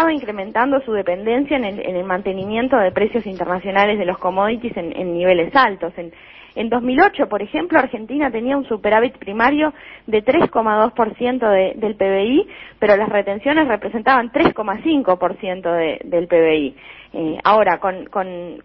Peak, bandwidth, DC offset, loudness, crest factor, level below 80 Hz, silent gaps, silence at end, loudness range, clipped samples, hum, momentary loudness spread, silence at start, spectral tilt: 0 dBFS; 6 kHz; under 0.1%; -18 LUFS; 18 dB; -50 dBFS; none; 0.05 s; 2 LU; under 0.1%; none; 9 LU; 0 s; -8.5 dB/octave